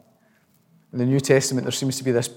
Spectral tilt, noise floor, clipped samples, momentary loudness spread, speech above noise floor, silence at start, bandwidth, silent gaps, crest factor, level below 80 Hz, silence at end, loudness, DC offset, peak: -5 dB/octave; -61 dBFS; under 0.1%; 7 LU; 40 dB; 0.95 s; 17 kHz; none; 20 dB; -74 dBFS; 0 s; -22 LUFS; under 0.1%; -4 dBFS